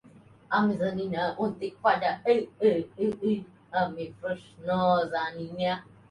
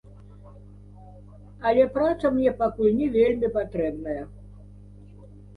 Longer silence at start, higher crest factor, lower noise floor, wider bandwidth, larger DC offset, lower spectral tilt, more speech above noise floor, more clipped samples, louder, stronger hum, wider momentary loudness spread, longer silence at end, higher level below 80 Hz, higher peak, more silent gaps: about the same, 0.5 s vs 0.45 s; about the same, 18 dB vs 18 dB; first, -55 dBFS vs -46 dBFS; about the same, 10.5 kHz vs 10.5 kHz; neither; about the same, -7.5 dB/octave vs -8.5 dB/octave; first, 27 dB vs 23 dB; neither; second, -28 LUFS vs -24 LUFS; second, none vs 50 Hz at -45 dBFS; about the same, 9 LU vs 11 LU; about the same, 0.3 s vs 0.2 s; second, -64 dBFS vs -48 dBFS; about the same, -10 dBFS vs -8 dBFS; neither